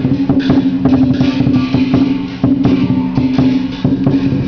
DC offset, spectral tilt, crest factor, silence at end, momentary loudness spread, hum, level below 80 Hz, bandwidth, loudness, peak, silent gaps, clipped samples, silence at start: under 0.1%; -8.5 dB/octave; 12 dB; 0 s; 3 LU; none; -34 dBFS; 5.4 kHz; -13 LUFS; 0 dBFS; none; under 0.1%; 0 s